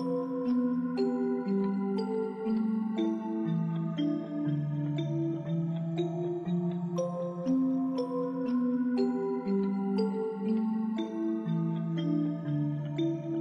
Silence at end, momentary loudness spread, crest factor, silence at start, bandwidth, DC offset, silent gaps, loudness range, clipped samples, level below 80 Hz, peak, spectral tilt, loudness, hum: 0 s; 4 LU; 12 dB; 0 s; 7.4 kHz; under 0.1%; none; 2 LU; under 0.1%; -76 dBFS; -18 dBFS; -9 dB/octave; -31 LUFS; none